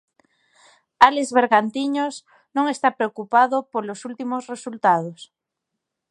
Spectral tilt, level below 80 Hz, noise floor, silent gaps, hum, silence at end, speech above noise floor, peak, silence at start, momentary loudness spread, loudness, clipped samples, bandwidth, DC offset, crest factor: -4 dB/octave; -68 dBFS; -82 dBFS; none; none; 0.85 s; 61 dB; 0 dBFS; 1 s; 14 LU; -20 LUFS; under 0.1%; 11.5 kHz; under 0.1%; 22 dB